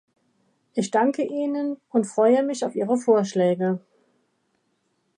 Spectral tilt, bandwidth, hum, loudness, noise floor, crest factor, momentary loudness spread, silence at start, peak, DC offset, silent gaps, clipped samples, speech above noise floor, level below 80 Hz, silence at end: -6 dB/octave; 10.5 kHz; none; -23 LUFS; -71 dBFS; 18 dB; 8 LU; 0.75 s; -6 dBFS; under 0.1%; none; under 0.1%; 49 dB; -76 dBFS; 1.4 s